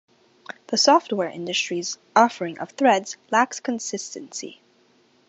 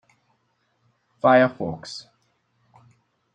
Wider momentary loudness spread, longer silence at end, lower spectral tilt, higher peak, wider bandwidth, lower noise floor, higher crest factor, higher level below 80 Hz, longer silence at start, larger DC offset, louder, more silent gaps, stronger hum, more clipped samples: second, 17 LU vs 20 LU; second, 0.75 s vs 1.35 s; second, -2.5 dB/octave vs -6 dB/octave; about the same, -2 dBFS vs -4 dBFS; second, 8.2 kHz vs 9.2 kHz; second, -60 dBFS vs -70 dBFS; about the same, 22 dB vs 22 dB; second, -78 dBFS vs -66 dBFS; second, 0.7 s vs 1.25 s; neither; about the same, -22 LUFS vs -20 LUFS; neither; neither; neither